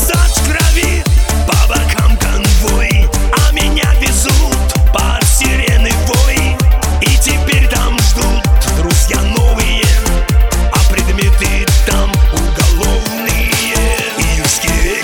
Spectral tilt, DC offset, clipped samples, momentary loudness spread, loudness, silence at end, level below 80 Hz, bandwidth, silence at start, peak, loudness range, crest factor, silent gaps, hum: -4 dB/octave; under 0.1%; under 0.1%; 2 LU; -12 LUFS; 0 s; -12 dBFS; 17.5 kHz; 0 s; 0 dBFS; 1 LU; 10 dB; none; none